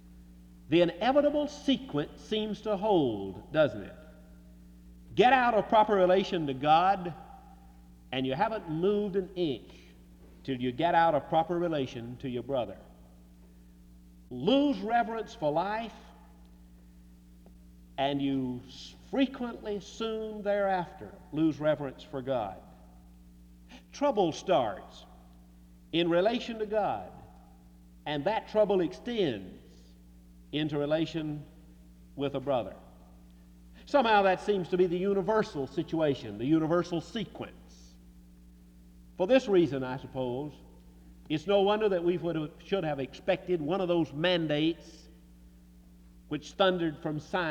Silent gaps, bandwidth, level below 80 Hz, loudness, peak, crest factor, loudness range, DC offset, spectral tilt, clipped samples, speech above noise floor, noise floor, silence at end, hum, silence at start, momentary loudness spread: none; 12 kHz; -56 dBFS; -30 LUFS; -10 dBFS; 22 dB; 7 LU; under 0.1%; -6.5 dB/octave; under 0.1%; 26 dB; -55 dBFS; 0 s; none; 0.05 s; 15 LU